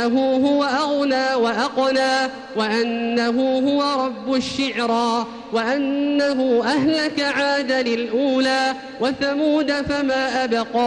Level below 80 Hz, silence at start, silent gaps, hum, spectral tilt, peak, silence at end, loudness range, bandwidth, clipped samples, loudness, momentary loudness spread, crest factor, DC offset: -54 dBFS; 0 s; none; none; -4 dB/octave; -8 dBFS; 0 s; 1 LU; 10.5 kHz; under 0.1%; -20 LUFS; 4 LU; 12 dB; under 0.1%